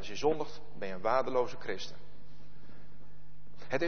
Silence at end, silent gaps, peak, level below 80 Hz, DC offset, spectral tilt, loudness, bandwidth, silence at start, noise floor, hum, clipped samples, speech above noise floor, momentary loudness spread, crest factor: 0 s; none; -14 dBFS; -62 dBFS; 2%; -5 dB/octave; -35 LUFS; 6.6 kHz; 0 s; -58 dBFS; none; under 0.1%; 24 dB; 15 LU; 20 dB